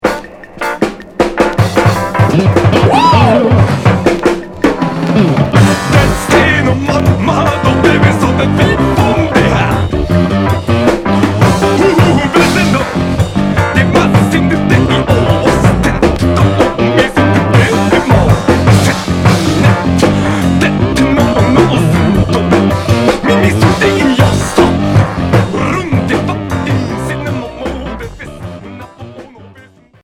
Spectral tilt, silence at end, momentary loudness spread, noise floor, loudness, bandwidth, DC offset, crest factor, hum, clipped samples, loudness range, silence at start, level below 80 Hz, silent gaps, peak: -6.5 dB/octave; 0.55 s; 8 LU; -41 dBFS; -10 LUFS; 16 kHz; under 0.1%; 10 dB; none; 0.6%; 3 LU; 0.05 s; -26 dBFS; none; 0 dBFS